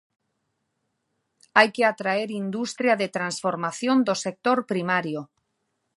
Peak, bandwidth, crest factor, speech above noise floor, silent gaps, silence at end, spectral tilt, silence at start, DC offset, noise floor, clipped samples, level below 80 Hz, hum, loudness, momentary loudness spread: 0 dBFS; 11.5 kHz; 24 dB; 53 dB; none; 0.7 s; -4.5 dB/octave; 1.55 s; under 0.1%; -76 dBFS; under 0.1%; -78 dBFS; none; -24 LUFS; 9 LU